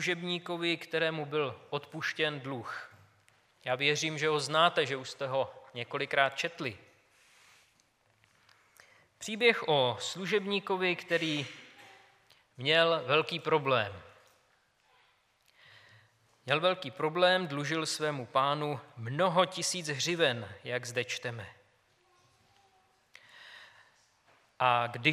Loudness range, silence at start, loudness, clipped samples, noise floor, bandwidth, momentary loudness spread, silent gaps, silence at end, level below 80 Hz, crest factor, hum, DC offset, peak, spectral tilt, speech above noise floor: 6 LU; 0 s; -31 LUFS; under 0.1%; -70 dBFS; 15 kHz; 16 LU; none; 0 s; -80 dBFS; 24 dB; none; under 0.1%; -10 dBFS; -3.5 dB/octave; 39 dB